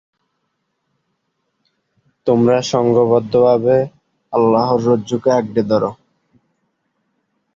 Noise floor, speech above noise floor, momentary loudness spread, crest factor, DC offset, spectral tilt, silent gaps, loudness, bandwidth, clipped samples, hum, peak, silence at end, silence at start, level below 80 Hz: -71 dBFS; 57 dB; 6 LU; 16 dB; under 0.1%; -7 dB/octave; none; -15 LUFS; 7.6 kHz; under 0.1%; none; -2 dBFS; 1.6 s; 2.25 s; -56 dBFS